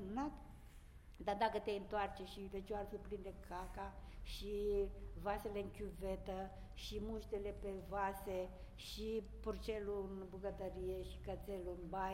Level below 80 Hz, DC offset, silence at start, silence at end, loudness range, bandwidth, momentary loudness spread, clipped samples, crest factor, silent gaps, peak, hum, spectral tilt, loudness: -54 dBFS; under 0.1%; 0 s; 0 s; 2 LU; 16 kHz; 11 LU; under 0.1%; 22 dB; none; -22 dBFS; none; -6 dB/octave; -46 LUFS